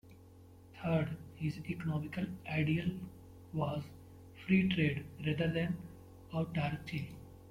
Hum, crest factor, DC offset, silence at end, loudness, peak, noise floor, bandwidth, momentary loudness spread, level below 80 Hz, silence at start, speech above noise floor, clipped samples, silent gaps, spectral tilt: none; 20 dB; under 0.1%; 0 s; -36 LUFS; -18 dBFS; -57 dBFS; 15.5 kHz; 20 LU; -62 dBFS; 0.05 s; 22 dB; under 0.1%; none; -8 dB/octave